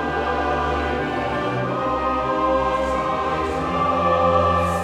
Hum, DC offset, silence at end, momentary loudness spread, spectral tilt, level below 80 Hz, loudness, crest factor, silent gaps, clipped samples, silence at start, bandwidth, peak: none; under 0.1%; 0 s; 6 LU; -6.5 dB/octave; -36 dBFS; -21 LUFS; 14 dB; none; under 0.1%; 0 s; 13.5 kHz; -6 dBFS